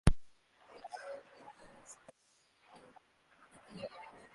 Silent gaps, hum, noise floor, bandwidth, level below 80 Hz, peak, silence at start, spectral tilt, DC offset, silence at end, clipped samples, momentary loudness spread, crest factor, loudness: none; none; -73 dBFS; 11.5 kHz; -46 dBFS; -10 dBFS; 0.05 s; -6 dB/octave; under 0.1%; 0.25 s; under 0.1%; 18 LU; 30 dB; -47 LUFS